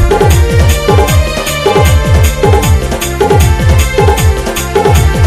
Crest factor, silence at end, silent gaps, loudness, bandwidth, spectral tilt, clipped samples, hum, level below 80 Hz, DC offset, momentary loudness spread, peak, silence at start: 8 dB; 0 s; none; -9 LUFS; 16 kHz; -5 dB/octave; 0.7%; none; -14 dBFS; under 0.1%; 4 LU; 0 dBFS; 0 s